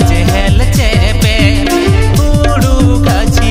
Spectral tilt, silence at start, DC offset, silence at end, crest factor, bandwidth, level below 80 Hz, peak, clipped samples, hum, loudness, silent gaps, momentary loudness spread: -5.5 dB/octave; 0 s; under 0.1%; 0 s; 8 dB; 16.5 kHz; -12 dBFS; 0 dBFS; 0.7%; none; -10 LUFS; none; 1 LU